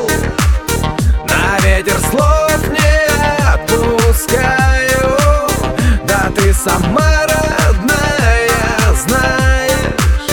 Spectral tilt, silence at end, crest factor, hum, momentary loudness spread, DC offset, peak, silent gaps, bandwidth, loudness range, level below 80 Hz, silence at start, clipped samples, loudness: -4.5 dB/octave; 0 s; 12 dB; none; 3 LU; under 0.1%; 0 dBFS; none; over 20 kHz; 1 LU; -16 dBFS; 0 s; under 0.1%; -12 LUFS